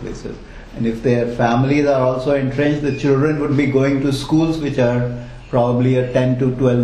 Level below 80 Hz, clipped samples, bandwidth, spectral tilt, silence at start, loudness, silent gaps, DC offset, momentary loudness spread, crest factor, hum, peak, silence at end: -38 dBFS; under 0.1%; 11.5 kHz; -7.5 dB/octave; 0 s; -17 LUFS; none; under 0.1%; 9 LU; 16 dB; none; 0 dBFS; 0 s